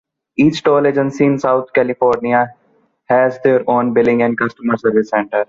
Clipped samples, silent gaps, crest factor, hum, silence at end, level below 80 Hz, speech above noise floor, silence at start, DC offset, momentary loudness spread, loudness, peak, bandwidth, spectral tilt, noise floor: under 0.1%; none; 14 dB; none; 0.05 s; -56 dBFS; 36 dB; 0.4 s; under 0.1%; 4 LU; -15 LUFS; -2 dBFS; 7.6 kHz; -7 dB/octave; -49 dBFS